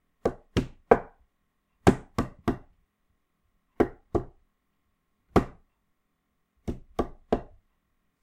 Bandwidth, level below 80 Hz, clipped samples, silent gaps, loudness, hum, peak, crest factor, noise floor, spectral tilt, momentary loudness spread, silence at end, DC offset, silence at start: 16 kHz; -44 dBFS; under 0.1%; none; -29 LUFS; none; 0 dBFS; 30 dB; -76 dBFS; -7 dB/octave; 15 LU; 0.8 s; under 0.1%; 0.25 s